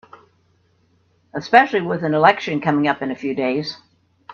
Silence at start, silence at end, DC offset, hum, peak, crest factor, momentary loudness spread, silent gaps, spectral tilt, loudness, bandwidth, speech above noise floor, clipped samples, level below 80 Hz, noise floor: 1.35 s; 0 s; under 0.1%; none; 0 dBFS; 20 dB; 16 LU; none; -6.5 dB/octave; -18 LUFS; 7 kHz; 43 dB; under 0.1%; -64 dBFS; -61 dBFS